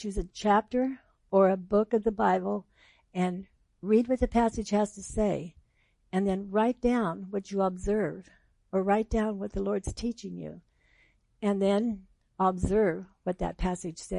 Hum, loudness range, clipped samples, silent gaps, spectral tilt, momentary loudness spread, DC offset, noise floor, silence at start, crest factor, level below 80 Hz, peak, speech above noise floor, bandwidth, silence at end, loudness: none; 4 LU; under 0.1%; none; -6.5 dB/octave; 11 LU; under 0.1%; -68 dBFS; 0 s; 18 dB; -46 dBFS; -12 dBFS; 40 dB; 11 kHz; 0 s; -29 LUFS